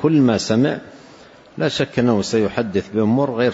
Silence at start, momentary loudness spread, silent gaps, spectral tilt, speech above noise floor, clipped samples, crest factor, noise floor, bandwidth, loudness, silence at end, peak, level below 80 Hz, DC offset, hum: 0 s; 7 LU; none; -6 dB/octave; 27 dB; under 0.1%; 14 dB; -44 dBFS; 8 kHz; -18 LUFS; 0 s; -4 dBFS; -54 dBFS; under 0.1%; none